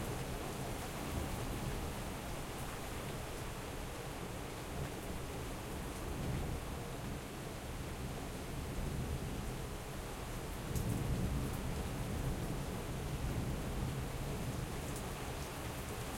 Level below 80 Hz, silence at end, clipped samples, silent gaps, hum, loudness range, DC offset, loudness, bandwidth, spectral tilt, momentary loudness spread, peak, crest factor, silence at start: -46 dBFS; 0 s; under 0.1%; none; none; 4 LU; under 0.1%; -42 LUFS; 16.5 kHz; -5 dB/octave; 5 LU; -24 dBFS; 16 dB; 0 s